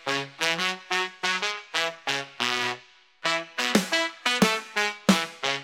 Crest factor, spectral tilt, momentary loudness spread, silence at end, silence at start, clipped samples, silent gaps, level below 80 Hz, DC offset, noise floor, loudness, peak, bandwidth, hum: 20 dB; -3 dB/octave; 6 LU; 0 s; 0.05 s; under 0.1%; none; -70 dBFS; under 0.1%; -50 dBFS; -25 LUFS; -6 dBFS; 16.5 kHz; none